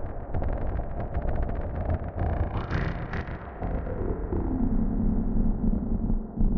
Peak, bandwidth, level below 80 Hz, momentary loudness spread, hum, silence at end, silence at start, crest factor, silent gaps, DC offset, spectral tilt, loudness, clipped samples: -12 dBFS; 5.8 kHz; -30 dBFS; 6 LU; none; 0 s; 0 s; 14 dB; none; under 0.1%; -10.5 dB/octave; -31 LUFS; under 0.1%